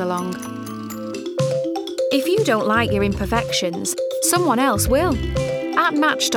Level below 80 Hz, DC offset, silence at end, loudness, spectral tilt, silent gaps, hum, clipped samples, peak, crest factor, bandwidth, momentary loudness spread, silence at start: -36 dBFS; under 0.1%; 0 s; -20 LUFS; -4 dB/octave; none; none; under 0.1%; -6 dBFS; 14 dB; 19.5 kHz; 11 LU; 0 s